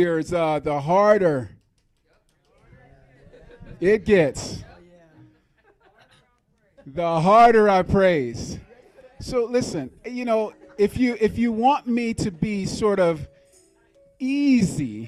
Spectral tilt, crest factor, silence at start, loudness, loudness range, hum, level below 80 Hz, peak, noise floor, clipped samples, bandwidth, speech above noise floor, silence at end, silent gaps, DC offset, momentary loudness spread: -6 dB/octave; 18 dB; 0 s; -21 LUFS; 6 LU; none; -48 dBFS; -4 dBFS; -65 dBFS; under 0.1%; 13.5 kHz; 45 dB; 0 s; none; under 0.1%; 16 LU